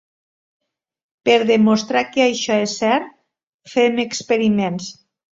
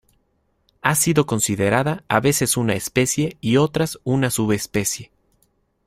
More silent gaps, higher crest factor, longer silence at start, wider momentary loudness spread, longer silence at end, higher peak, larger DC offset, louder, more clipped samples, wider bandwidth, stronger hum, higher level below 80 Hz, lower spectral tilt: first, 3.43-3.59 s vs none; about the same, 18 dB vs 20 dB; first, 1.25 s vs 0.85 s; first, 9 LU vs 5 LU; second, 0.4 s vs 0.8 s; about the same, -2 dBFS vs -2 dBFS; neither; about the same, -18 LUFS vs -20 LUFS; neither; second, 7.8 kHz vs 16 kHz; neither; second, -60 dBFS vs -50 dBFS; about the same, -4.5 dB/octave vs -4.5 dB/octave